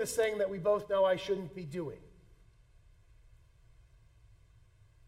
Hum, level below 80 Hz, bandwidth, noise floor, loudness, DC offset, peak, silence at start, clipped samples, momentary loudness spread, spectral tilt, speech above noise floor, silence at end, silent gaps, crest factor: none; -62 dBFS; 16 kHz; -62 dBFS; -33 LUFS; under 0.1%; -18 dBFS; 0 s; under 0.1%; 12 LU; -4.5 dB/octave; 30 dB; 3 s; none; 18 dB